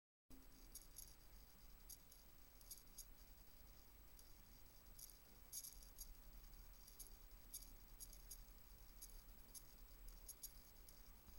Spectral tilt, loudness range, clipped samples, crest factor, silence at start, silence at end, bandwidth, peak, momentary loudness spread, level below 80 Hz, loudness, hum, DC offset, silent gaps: -2 dB/octave; 4 LU; under 0.1%; 24 dB; 0.3 s; 0 s; 16.5 kHz; -38 dBFS; 8 LU; -66 dBFS; -61 LUFS; none; under 0.1%; none